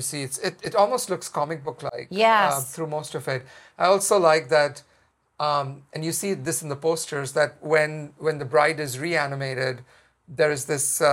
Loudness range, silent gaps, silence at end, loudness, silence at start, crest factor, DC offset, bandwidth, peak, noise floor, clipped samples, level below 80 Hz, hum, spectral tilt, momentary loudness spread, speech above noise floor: 4 LU; none; 0 s; -24 LUFS; 0 s; 20 dB; under 0.1%; 16.5 kHz; -4 dBFS; -58 dBFS; under 0.1%; -68 dBFS; none; -3.5 dB/octave; 11 LU; 35 dB